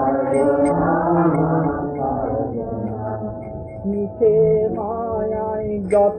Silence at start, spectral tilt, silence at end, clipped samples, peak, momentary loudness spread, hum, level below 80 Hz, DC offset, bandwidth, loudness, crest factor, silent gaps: 0 s; -10 dB/octave; 0 s; under 0.1%; -6 dBFS; 10 LU; none; -42 dBFS; under 0.1%; 9.2 kHz; -20 LUFS; 14 dB; none